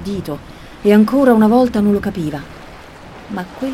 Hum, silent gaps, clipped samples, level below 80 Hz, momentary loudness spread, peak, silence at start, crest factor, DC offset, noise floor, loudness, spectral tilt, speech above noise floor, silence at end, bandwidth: none; none; under 0.1%; -42 dBFS; 19 LU; 0 dBFS; 0 s; 16 dB; under 0.1%; -36 dBFS; -14 LUFS; -7.5 dB/octave; 22 dB; 0 s; 14.5 kHz